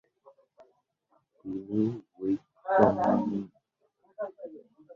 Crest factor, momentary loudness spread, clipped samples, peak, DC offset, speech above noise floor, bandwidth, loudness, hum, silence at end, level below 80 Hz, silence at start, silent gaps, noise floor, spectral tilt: 26 dB; 23 LU; under 0.1%; -6 dBFS; under 0.1%; 45 dB; 7 kHz; -29 LUFS; none; 0 s; -66 dBFS; 1.45 s; none; -72 dBFS; -9.5 dB/octave